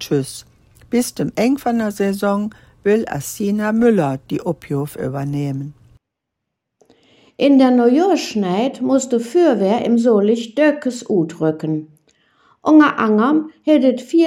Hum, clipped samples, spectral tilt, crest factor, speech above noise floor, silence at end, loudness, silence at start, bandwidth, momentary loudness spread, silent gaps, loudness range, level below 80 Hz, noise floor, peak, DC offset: none; under 0.1%; -6 dB/octave; 16 dB; 63 dB; 0 s; -17 LUFS; 0 s; 16.5 kHz; 11 LU; none; 5 LU; -56 dBFS; -79 dBFS; 0 dBFS; under 0.1%